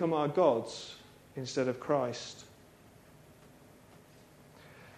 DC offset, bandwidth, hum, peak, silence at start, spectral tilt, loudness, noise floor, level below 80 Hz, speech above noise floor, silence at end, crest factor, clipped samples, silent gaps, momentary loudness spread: under 0.1%; 14 kHz; none; -14 dBFS; 0 s; -5.5 dB/octave; -32 LUFS; -58 dBFS; -72 dBFS; 27 dB; 0 s; 22 dB; under 0.1%; none; 25 LU